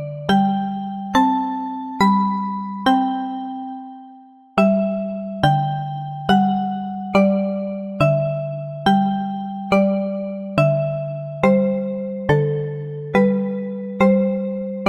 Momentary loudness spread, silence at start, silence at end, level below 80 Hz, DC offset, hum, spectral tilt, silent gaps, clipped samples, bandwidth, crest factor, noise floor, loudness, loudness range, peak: 10 LU; 0 s; 0 s; -50 dBFS; under 0.1%; none; -7.5 dB/octave; none; under 0.1%; 11 kHz; 18 dB; -45 dBFS; -20 LUFS; 2 LU; -2 dBFS